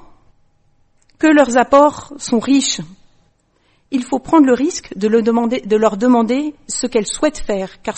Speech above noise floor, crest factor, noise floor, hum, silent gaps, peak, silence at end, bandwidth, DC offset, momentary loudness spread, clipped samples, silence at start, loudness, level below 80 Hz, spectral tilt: 44 dB; 16 dB; -59 dBFS; none; none; 0 dBFS; 0 s; 8.8 kHz; under 0.1%; 11 LU; under 0.1%; 1.2 s; -15 LUFS; -44 dBFS; -4 dB/octave